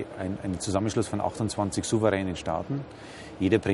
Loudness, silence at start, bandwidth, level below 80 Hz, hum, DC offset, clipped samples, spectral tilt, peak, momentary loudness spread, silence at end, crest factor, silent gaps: -28 LUFS; 0 s; 11.5 kHz; -52 dBFS; none; under 0.1%; under 0.1%; -5.5 dB/octave; -8 dBFS; 10 LU; 0 s; 20 dB; none